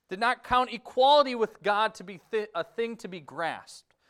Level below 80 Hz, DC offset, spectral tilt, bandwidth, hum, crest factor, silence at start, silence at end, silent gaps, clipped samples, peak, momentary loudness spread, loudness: -60 dBFS; under 0.1%; -3.5 dB/octave; 13 kHz; none; 20 dB; 0.1 s; 0.3 s; none; under 0.1%; -8 dBFS; 16 LU; -27 LUFS